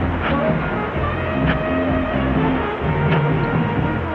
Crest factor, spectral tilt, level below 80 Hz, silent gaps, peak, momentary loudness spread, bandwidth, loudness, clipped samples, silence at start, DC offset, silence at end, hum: 14 dB; -9.5 dB/octave; -32 dBFS; none; -6 dBFS; 4 LU; 5.4 kHz; -20 LUFS; under 0.1%; 0 s; under 0.1%; 0 s; none